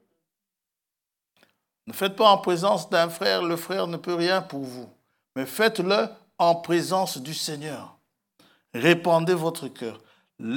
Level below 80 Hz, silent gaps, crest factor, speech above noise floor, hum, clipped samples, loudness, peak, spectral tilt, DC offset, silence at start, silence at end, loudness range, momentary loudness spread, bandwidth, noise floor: -82 dBFS; none; 22 dB; 64 dB; none; under 0.1%; -24 LUFS; -4 dBFS; -4.5 dB/octave; under 0.1%; 1.85 s; 0 s; 3 LU; 17 LU; 18 kHz; -87 dBFS